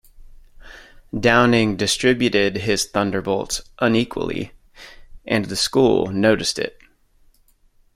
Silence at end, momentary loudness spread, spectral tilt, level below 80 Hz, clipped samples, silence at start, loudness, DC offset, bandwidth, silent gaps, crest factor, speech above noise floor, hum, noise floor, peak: 1.25 s; 11 LU; -4 dB/octave; -44 dBFS; under 0.1%; 0.15 s; -19 LUFS; under 0.1%; 16 kHz; none; 18 dB; 38 dB; none; -56 dBFS; -2 dBFS